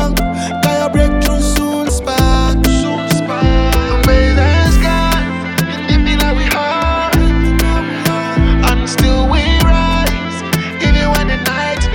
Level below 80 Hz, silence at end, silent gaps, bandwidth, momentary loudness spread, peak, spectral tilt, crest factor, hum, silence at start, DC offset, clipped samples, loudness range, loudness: -16 dBFS; 0 s; none; over 20 kHz; 5 LU; 0 dBFS; -5 dB/octave; 12 dB; none; 0 s; under 0.1%; under 0.1%; 1 LU; -13 LUFS